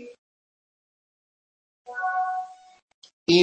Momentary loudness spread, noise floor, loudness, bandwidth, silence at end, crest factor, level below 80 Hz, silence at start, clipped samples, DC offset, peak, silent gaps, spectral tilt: 17 LU; under -90 dBFS; -28 LUFS; 8.6 kHz; 0 s; 22 dB; -68 dBFS; 0 s; under 0.1%; under 0.1%; -6 dBFS; 0.18-1.85 s, 2.82-2.88 s, 2.94-3.02 s, 3.13-3.26 s; -5 dB/octave